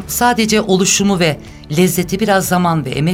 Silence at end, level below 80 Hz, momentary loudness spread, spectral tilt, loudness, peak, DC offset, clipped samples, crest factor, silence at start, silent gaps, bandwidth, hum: 0 s; -40 dBFS; 5 LU; -4 dB/octave; -14 LUFS; 0 dBFS; under 0.1%; under 0.1%; 14 dB; 0 s; none; 17 kHz; none